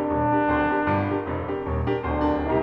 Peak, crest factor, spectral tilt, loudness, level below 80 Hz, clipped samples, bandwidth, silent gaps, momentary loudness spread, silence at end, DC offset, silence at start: -10 dBFS; 14 dB; -9.5 dB/octave; -24 LUFS; -36 dBFS; under 0.1%; 5.6 kHz; none; 6 LU; 0 s; under 0.1%; 0 s